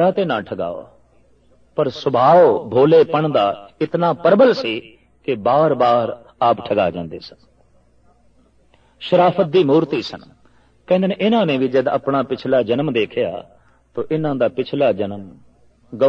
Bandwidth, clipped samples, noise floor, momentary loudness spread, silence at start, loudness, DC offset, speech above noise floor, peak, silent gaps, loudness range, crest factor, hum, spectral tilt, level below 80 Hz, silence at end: 6.8 kHz; under 0.1%; -54 dBFS; 16 LU; 0 s; -17 LUFS; under 0.1%; 38 dB; -2 dBFS; none; 6 LU; 16 dB; none; -8 dB/octave; -58 dBFS; 0 s